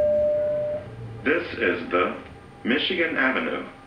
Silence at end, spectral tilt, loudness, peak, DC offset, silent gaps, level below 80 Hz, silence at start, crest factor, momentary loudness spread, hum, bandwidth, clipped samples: 0 s; -6.5 dB/octave; -24 LUFS; -8 dBFS; under 0.1%; none; -54 dBFS; 0 s; 16 dB; 12 LU; none; 9.6 kHz; under 0.1%